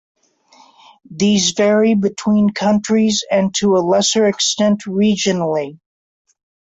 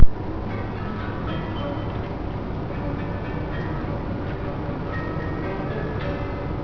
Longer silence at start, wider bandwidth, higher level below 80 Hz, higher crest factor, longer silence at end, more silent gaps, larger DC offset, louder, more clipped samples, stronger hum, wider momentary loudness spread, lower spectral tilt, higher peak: first, 1.1 s vs 0 s; first, 8 kHz vs 5.4 kHz; second, -56 dBFS vs -30 dBFS; second, 12 dB vs 22 dB; first, 1 s vs 0 s; neither; neither; first, -15 LUFS vs -29 LUFS; neither; neither; first, 5 LU vs 2 LU; second, -4 dB/octave vs -9 dB/octave; second, -4 dBFS vs 0 dBFS